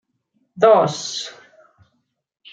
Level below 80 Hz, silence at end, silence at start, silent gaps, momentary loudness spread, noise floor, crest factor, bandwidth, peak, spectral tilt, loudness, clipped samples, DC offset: -70 dBFS; 1.2 s; 0.55 s; none; 15 LU; -71 dBFS; 20 dB; 9 kHz; -2 dBFS; -4 dB/octave; -17 LUFS; under 0.1%; under 0.1%